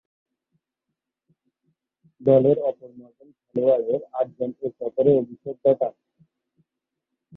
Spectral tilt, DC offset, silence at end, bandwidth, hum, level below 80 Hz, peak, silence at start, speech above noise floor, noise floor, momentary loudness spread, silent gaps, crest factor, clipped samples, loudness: -11.5 dB/octave; under 0.1%; 1.45 s; 4 kHz; none; -68 dBFS; -6 dBFS; 2.2 s; 62 dB; -84 dBFS; 12 LU; none; 20 dB; under 0.1%; -22 LUFS